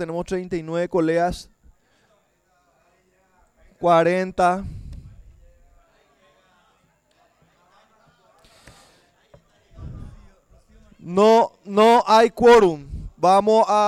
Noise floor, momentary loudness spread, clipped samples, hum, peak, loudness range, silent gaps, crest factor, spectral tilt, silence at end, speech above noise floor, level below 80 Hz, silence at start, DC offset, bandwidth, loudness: -64 dBFS; 25 LU; under 0.1%; none; -6 dBFS; 11 LU; none; 16 dB; -5.5 dB/octave; 0 s; 47 dB; -46 dBFS; 0 s; under 0.1%; 13.5 kHz; -18 LUFS